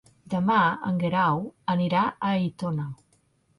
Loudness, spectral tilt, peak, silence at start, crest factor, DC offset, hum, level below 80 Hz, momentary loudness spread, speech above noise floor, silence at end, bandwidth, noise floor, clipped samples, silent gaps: -25 LUFS; -8 dB/octave; -10 dBFS; 0.3 s; 16 dB; under 0.1%; none; -62 dBFS; 9 LU; 41 dB; 0.65 s; 11 kHz; -66 dBFS; under 0.1%; none